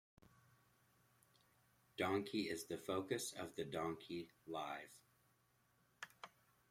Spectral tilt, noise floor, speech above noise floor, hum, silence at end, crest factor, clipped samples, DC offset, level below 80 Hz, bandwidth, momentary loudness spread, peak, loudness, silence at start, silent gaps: -4 dB/octave; -78 dBFS; 33 dB; none; 0.45 s; 22 dB; under 0.1%; under 0.1%; -82 dBFS; 16.5 kHz; 16 LU; -26 dBFS; -45 LUFS; 2 s; none